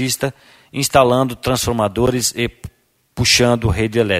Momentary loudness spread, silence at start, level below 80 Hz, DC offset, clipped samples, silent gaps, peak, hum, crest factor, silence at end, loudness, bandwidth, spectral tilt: 11 LU; 0 s; -36 dBFS; under 0.1%; under 0.1%; none; 0 dBFS; none; 18 dB; 0 s; -16 LUFS; 16 kHz; -4 dB/octave